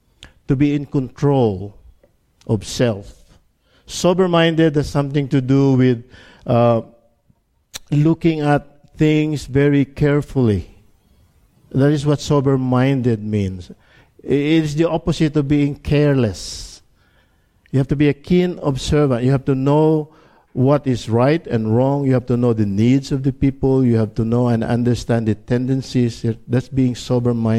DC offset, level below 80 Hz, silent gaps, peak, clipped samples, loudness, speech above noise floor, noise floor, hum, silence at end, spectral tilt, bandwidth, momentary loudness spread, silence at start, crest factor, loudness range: under 0.1%; -40 dBFS; none; -2 dBFS; under 0.1%; -17 LUFS; 44 dB; -60 dBFS; none; 0 s; -7.5 dB/octave; 12.5 kHz; 8 LU; 0.2 s; 16 dB; 3 LU